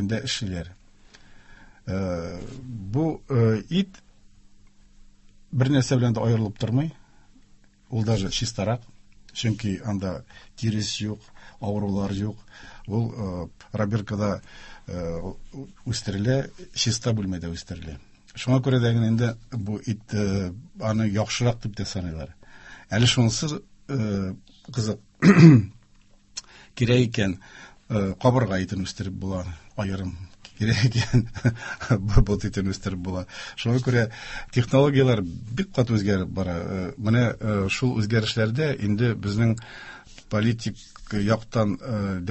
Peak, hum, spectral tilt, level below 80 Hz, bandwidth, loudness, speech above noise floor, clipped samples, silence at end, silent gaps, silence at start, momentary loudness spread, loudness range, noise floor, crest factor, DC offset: -2 dBFS; none; -6 dB/octave; -42 dBFS; 8.4 kHz; -25 LUFS; 31 dB; under 0.1%; 0 s; none; 0 s; 16 LU; 9 LU; -55 dBFS; 24 dB; under 0.1%